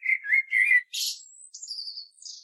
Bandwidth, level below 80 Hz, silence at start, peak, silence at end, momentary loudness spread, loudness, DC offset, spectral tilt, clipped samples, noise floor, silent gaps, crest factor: 14.5 kHz; under -90 dBFS; 0 s; -12 dBFS; 0.05 s; 21 LU; -23 LUFS; under 0.1%; 11.5 dB/octave; under 0.1%; -46 dBFS; none; 16 dB